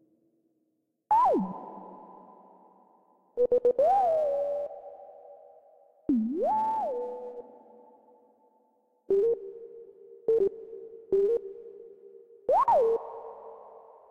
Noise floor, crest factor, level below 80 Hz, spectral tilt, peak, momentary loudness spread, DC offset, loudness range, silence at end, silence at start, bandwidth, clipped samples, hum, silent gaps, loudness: -77 dBFS; 14 dB; -66 dBFS; -8.5 dB/octave; -16 dBFS; 24 LU; under 0.1%; 4 LU; 0.35 s; 1.1 s; 7 kHz; under 0.1%; none; none; -27 LUFS